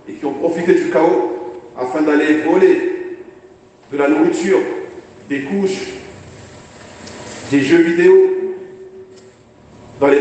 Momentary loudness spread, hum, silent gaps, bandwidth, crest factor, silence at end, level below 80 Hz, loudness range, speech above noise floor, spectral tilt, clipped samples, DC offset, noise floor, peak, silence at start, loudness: 22 LU; none; none; 8.6 kHz; 16 dB; 0 s; -58 dBFS; 4 LU; 31 dB; -6 dB/octave; under 0.1%; under 0.1%; -44 dBFS; 0 dBFS; 0.05 s; -15 LUFS